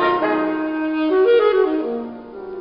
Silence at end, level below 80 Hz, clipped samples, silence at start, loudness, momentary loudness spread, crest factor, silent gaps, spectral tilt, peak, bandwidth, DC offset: 0 s; -56 dBFS; under 0.1%; 0 s; -18 LUFS; 17 LU; 14 dB; none; -8 dB/octave; -4 dBFS; 5.4 kHz; under 0.1%